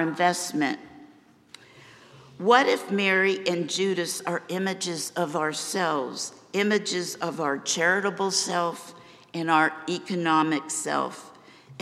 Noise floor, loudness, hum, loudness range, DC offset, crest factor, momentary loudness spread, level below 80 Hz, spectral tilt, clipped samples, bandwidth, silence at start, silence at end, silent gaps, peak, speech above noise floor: -55 dBFS; -25 LUFS; none; 3 LU; under 0.1%; 22 dB; 10 LU; -78 dBFS; -3 dB/octave; under 0.1%; 15.5 kHz; 0 s; 0.05 s; none; -4 dBFS; 29 dB